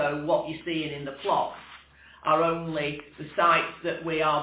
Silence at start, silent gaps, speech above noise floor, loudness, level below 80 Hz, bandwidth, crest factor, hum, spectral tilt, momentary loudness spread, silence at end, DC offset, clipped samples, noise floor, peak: 0 s; none; 25 dB; -27 LUFS; -60 dBFS; 4 kHz; 18 dB; none; -9 dB/octave; 12 LU; 0 s; under 0.1%; under 0.1%; -52 dBFS; -10 dBFS